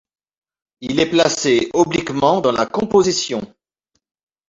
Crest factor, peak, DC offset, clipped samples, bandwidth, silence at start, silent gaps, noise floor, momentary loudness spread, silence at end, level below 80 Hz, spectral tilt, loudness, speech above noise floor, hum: 18 dB; -2 dBFS; under 0.1%; under 0.1%; 7.8 kHz; 0.8 s; none; -72 dBFS; 9 LU; 1.05 s; -52 dBFS; -4 dB/octave; -17 LUFS; 55 dB; none